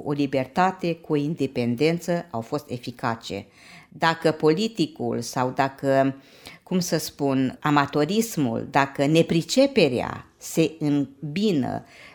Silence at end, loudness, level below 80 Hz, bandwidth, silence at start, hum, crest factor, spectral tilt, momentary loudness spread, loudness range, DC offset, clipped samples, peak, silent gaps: 0.05 s; -24 LUFS; -60 dBFS; over 20 kHz; 0 s; none; 20 dB; -5.5 dB/octave; 10 LU; 4 LU; under 0.1%; under 0.1%; -4 dBFS; none